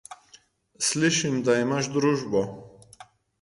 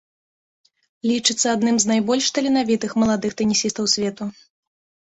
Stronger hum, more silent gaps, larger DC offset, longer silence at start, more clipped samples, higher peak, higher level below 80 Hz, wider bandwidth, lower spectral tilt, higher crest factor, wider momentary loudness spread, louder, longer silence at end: neither; neither; neither; second, 0.1 s vs 1.05 s; neither; second, -10 dBFS vs -2 dBFS; about the same, -62 dBFS vs -60 dBFS; first, 11.5 kHz vs 8.4 kHz; about the same, -4 dB/octave vs -3 dB/octave; about the same, 16 dB vs 18 dB; first, 12 LU vs 7 LU; second, -24 LUFS vs -20 LUFS; second, 0.4 s vs 0.75 s